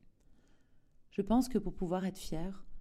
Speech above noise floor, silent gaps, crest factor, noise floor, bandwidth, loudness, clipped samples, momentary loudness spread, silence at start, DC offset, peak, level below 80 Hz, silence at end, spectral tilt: 29 dB; none; 18 dB; -63 dBFS; 15 kHz; -36 LUFS; under 0.1%; 11 LU; 0.3 s; under 0.1%; -20 dBFS; -48 dBFS; 0 s; -6.5 dB/octave